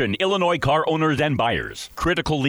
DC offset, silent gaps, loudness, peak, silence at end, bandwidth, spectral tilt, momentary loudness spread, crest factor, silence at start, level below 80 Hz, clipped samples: under 0.1%; none; -21 LUFS; -10 dBFS; 0 s; over 20 kHz; -5.5 dB/octave; 6 LU; 12 dB; 0 s; -42 dBFS; under 0.1%